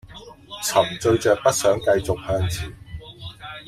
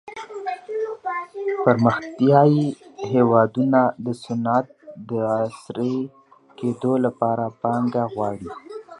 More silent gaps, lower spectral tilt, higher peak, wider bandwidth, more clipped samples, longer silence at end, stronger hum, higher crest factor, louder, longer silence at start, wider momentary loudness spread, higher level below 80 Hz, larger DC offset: neither; second, -4.5 dB/octave vs -8.5 dB/octave; about the same, -2 dBFS vs -2 dBFS; first, 16 kHz vs 11 kHz; neither; about the same, 0.05 s vs 0 s; neither; about the same, 20 dB vs 20 dB; about the same, -21 LUFS vs -22 LUFS; about the same, 0.05 s vs 0.05 s; first, 20 LU vs 14 LU; first, -44 dBFS vs -62 dBFS; neither